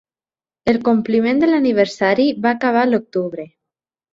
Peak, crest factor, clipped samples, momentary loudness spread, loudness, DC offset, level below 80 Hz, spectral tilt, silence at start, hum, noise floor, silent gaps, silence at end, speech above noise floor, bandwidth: -2 dBFS; 16 dB; under 0.1%; 9 LU; -17 LUFS; under 0.1%; -56 dBFS; -6.5 dB/octave; 0.65 s; none; under -90 dBFS; none; 0.7 s; over 74 dB; 7.8 kHz